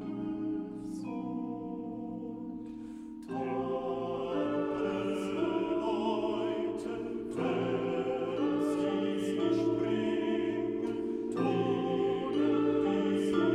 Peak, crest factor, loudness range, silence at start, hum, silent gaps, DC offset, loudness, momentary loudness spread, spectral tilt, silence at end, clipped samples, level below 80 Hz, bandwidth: -16 dBFS; 16 dB; 7 LU; 0 s; none; none; under 0.1%; -33 LUFS; 10 LU; -7 dB/octave; 0 s; under 0.1%; -64 dBFS; 11.5 kHz